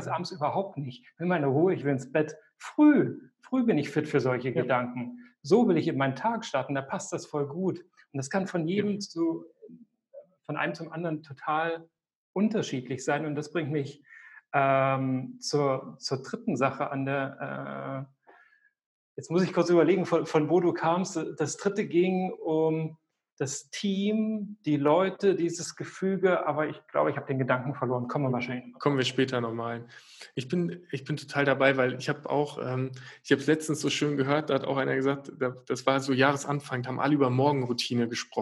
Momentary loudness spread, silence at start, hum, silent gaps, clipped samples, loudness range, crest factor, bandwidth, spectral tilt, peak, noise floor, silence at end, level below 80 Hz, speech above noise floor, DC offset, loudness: 12 LU; 0 s; none; 12.15-12.34 s, 18.86-19.15 s, 23.32-23.37 s; under 0.1%; 6 LU; 22 dB; 12 kHz; -5.5 dB/octave; -6 dBFS; -63 dBFS; 0 s; -78 dBFS; 35 dB; under 0.1%; -28 LUFS